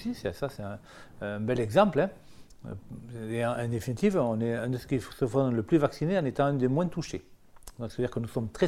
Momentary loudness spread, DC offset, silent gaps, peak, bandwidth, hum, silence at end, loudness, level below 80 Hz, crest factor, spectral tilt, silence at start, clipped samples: 16 LU; under 0.1%; none; -8 dBFS; 15.5 kHz; none; 0 s; -29 LUFS; -54 dBFS; 22 dB; -7 dB/octave; 0 s; under 0.1%